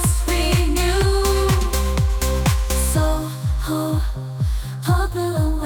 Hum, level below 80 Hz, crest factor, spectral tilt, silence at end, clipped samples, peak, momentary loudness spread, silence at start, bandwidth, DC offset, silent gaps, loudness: none; -22 dBFS; 12 dB; -5 dB/octave; 0 s; under 0.1%; -6 dBFS; 6 LU; 0 s; 19.5 kHz; under 0.1%; none; -20 LUFS